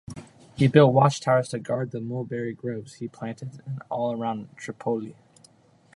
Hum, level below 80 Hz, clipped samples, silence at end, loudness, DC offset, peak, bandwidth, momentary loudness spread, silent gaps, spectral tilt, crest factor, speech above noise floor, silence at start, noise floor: none; -62 dBFS; under 0.1%; 0.85 s; -25 LUFS; under 0.1%; -2 dBFS; 11.5 kHz; 20 LU; none; -7 dB/octave; 24 dB; 33 dB; 0.1 s; -57 dBFS